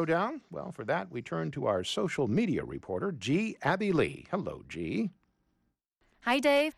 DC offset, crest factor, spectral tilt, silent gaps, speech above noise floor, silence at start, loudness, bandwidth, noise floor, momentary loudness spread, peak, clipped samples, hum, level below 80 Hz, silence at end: under 0.1%; 16 dB; -6 dB/octave; none; 47 dB; 0 s; -32 LUFS; 14 kHz; -78 dBFS; 10 LU; -16 dBFS; under 0.1%; none; -62 dBFS; 0.05 s